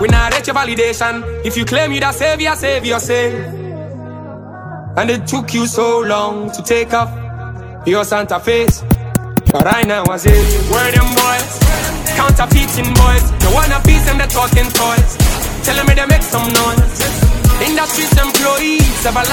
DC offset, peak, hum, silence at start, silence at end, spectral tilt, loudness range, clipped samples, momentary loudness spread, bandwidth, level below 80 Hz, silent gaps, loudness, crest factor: under 0.1%; 0 dBFS; none; 0 s; 0 s; -4.5 dB/octave; 6 LU; 0.1%; 10 LU; over 20 kHz; -18 dBFS; none; -13 LUFS; 12 dB